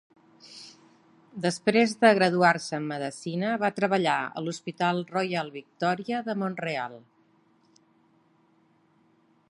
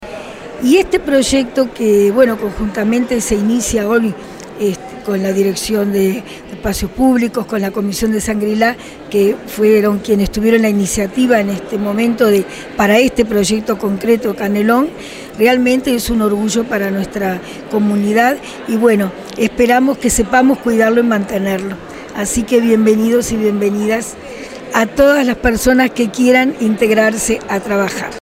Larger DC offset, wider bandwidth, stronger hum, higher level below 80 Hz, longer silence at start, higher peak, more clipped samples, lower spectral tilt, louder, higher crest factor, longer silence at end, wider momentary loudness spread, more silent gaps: neither; second, 11.5 kHz vs 16 kHz; neither; second, -76 dBFS vs -36 dBFS; first, 0.45 s vs 0 s; second, -6 dBFS vs 0 dBFS; neither; about the same, -5 dB/octave vs -4.5 dB/octave; second, -26 LUFS vs -14 LUFS; first, 22 dB vs 14 dB; first, 2.5 s vs 0.1 s; first, 18 LU vs 9 LU; neither